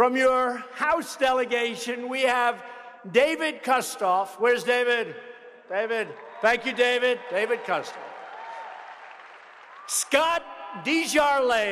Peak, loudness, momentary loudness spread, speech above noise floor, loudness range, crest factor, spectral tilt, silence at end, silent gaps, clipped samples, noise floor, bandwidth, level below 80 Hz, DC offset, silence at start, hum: -8 dBFS; -24 LUFS; 18 LU; 23 dB; 4 LU; 18 dB; -2 dB/octave; 0 s; none; under 0.1%; -47 dBFS; 14.5 kHz; -64 dBFS; under 0.1%; 0 s; none